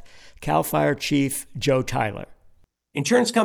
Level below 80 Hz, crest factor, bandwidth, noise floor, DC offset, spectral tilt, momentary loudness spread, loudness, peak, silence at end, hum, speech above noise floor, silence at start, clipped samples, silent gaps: -48 dBFS; 16 dB; over 20 kHz; -55 dBFS; under 0.1%; -4.5 dB/octave; 13 LU; -23 LUFS; -6 dBFS; 0 s; none; 33 dB; 0.05 s; under 0.1%; none